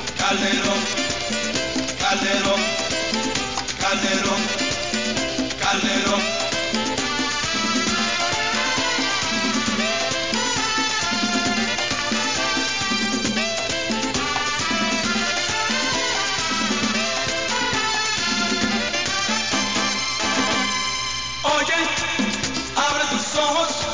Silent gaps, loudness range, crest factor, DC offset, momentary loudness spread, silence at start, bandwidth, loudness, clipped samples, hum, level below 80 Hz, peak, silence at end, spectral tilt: none; 1 LU; 16 dB; 0.8%; 3 LU; 0 s; 7.8 kHz; -20 LUFS; under 0.1%; none; -46 dBFS; -6 dBFS; 0 s; -2 dB/octave